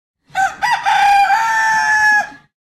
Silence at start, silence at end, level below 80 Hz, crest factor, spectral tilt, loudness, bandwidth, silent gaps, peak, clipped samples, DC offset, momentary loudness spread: 0.35 s; 0.4 s; -54 dBFS; 12 dB; 0 dB/octave; -13 LUFS; 15.5 kHz; none; -4 dBFS; under 0.1%; under 0.1%; 8 LU